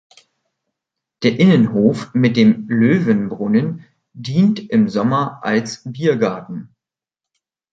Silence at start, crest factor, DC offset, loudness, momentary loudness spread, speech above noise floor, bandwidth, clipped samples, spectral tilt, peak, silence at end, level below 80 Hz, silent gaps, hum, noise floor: 1.2 s; 16 dB; under 0.1%; -16 LUFS; 14 LU; 71 dB; 7.8 kHz; under 0.1%; -7.5 dB/octave; -2 dBFS; 1.1 s; -58 dBFS; none; none; -87 dBFS